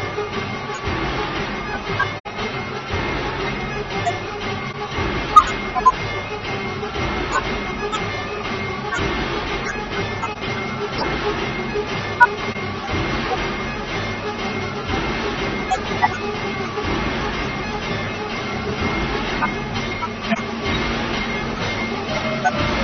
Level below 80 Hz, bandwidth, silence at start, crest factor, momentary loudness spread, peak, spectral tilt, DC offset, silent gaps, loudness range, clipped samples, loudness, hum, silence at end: -36 dBFS; 11 kHz; 0 s; 22 dB; 7 LU; 0 dBFS; -5 dB/octave; under 0.1%; 2.20-2.24 s; 4 LU; under 0.1%; -22 LUFS; none; 0 s